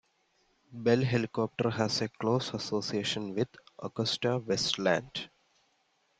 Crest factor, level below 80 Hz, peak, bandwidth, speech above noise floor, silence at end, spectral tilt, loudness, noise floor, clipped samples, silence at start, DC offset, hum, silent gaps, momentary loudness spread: 20 dB; -68 dBFS; -12 dBFS; 9.4 kHz; 42 dB; 0.95 s; -5 dB/octave; -31 LUFS; -73 dBFS; under 0.1%; 0.7 s; under 0.1%; none; none; 12 LU